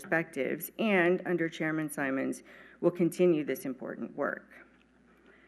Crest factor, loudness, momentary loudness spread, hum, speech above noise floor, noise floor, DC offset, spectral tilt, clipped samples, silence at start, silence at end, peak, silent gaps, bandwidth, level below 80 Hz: 18 dB; -31 LUFS; 12 LU; none; 32 dB; -63 dBFS; under 0.1%; -6 dB/octave; under 0.1%; 0 s; 0.85 s; -12 dBFS; none; 13.5 kHz; -74 dBFS